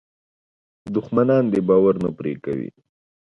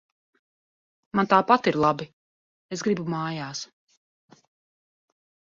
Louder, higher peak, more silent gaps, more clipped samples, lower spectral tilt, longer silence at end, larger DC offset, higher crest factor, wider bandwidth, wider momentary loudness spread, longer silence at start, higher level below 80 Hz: first, -20 LUFS vs -24 LUFS; about the same, -4 dBFS vs -4 dBFS; second, none vs 2.13-2.69 s; neither; first, -10 dB/octave vs -5.5 dB/octave; second, 0.65 s vs 1.85 s; neither; second, 18 dB vs 24 dB; second, 6.2 kHz vs 7.6 kHz; second, 11 LU vs 17 LU; second, 0.85 s vs 1.15 s; first, -56 dBFS vs -66 dBFS